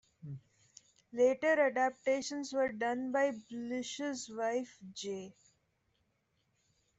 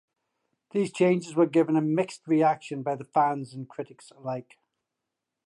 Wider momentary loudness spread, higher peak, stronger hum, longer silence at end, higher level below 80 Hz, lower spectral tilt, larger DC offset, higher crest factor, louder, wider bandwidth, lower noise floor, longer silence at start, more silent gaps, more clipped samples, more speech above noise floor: first, 18 LU vs 15 LU; second, -18 dBFS vs -10 dBFS; neither; first, 1.65 s vs 1.05 s; about the same, -78 dBFS vs -78 dBFS; second, -4 dB/octave vs -7 dB/octave; neither; about the same, 18 dB vs 18 dB; second, -34 LUFS vs -26 LUFS; second, 8.2 kHz vs 11.5 kHz; second, -79 dBFS vs -85 dBFS; second, 0.25 s vs 0.75 s; neither; neither; second, 44 dB vs 59 dB